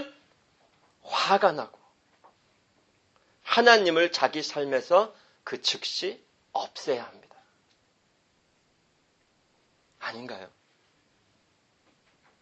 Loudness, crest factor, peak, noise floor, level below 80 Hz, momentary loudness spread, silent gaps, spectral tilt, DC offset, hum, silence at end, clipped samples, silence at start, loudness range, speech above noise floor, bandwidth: -25 LUFS; 28 dB; -2 dBFS; -69 dBFS; -80 dBFS; 24 LU; none; -2.5 dB/octave; under 0.1%; none; 1.95 s; under 0.1%; 0 s; 21 LU; 44 dB; 8.4 kHz